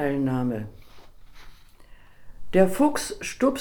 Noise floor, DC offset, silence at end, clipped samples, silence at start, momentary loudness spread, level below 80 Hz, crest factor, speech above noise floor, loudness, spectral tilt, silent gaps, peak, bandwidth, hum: -48 dBFS; under 0.1%; 0 s; under 0.1%; 0 s; 12 LU; -48 dBFS; 20 dB; 24 dB; -24 LUFS; -5.5 dB/octave; none; -6 dBFS; 20 kHz; none